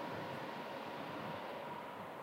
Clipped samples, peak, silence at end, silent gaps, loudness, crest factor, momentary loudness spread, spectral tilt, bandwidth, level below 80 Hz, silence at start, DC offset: under 0.1%; -32 dBFS; 0 s; none; -45 LUFS; 14 dB; 3 LU; -5.5 dB/octave; 16 kHz; -84 dBFS; 0 s; under 0.1%